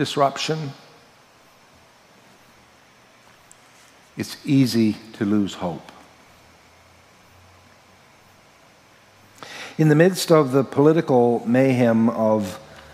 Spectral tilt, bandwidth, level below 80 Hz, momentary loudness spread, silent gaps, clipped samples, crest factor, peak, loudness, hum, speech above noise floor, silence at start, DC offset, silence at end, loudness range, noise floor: -6.5 dB/octave; 16 kHz; -66 dBFS; 18 LU; none; under 0.1%; 22 dB; -2 dBFS; -20 LUFS; none; 34 dB; 0 s; under 0.1%; 0.15 s; 17 LU; -53 dBFS